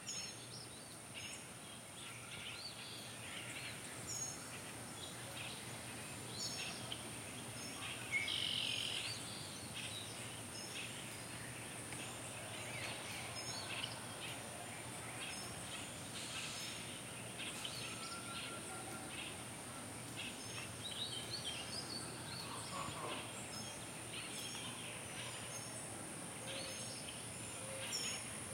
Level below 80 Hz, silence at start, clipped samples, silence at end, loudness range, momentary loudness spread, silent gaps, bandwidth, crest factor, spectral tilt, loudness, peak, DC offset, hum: -74 dBFS; 0 s; under 0.1%; 0 s; 5 LU; 6 LU; none; 16.5 kHz; 20 dB; -2 dB/octave; -45 LUFS; -28 dBFS; under 0.1%; none